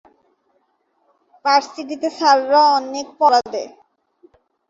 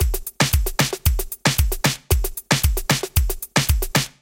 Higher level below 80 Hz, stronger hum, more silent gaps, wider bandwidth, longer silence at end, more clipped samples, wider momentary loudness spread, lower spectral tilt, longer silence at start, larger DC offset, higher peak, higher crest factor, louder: second, -70 dBFS vs -24 dBFS; neither; neither; second, 7.8 kHz vs 17.5 kHz; first, 1 s vs 0.15 s; neither; first, 15 LU vs 3 LU; second, -1.5 dB/octave vs -3.5 dB/octave; first, 1.45 s vs 0 s; neither; about the same, -2 dBFS vs 0 dBFS; about the same, 18 dB vs 20 dB; first, -17 LUFS vs -21 LUFS